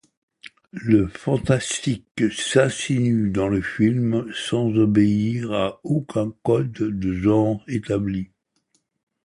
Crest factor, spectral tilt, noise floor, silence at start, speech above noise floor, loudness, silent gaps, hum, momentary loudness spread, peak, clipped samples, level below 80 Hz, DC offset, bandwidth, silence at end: 18 dB; -6 dB/octave; -69 dBFS; 0.45 s; 48 dB; -22 LUFS; 2.11-2.15 s; none; 7 LU; -2 dBFS; under 0.1%; -48 dBFS; under 0.1%; 11.5 kHz; 1 s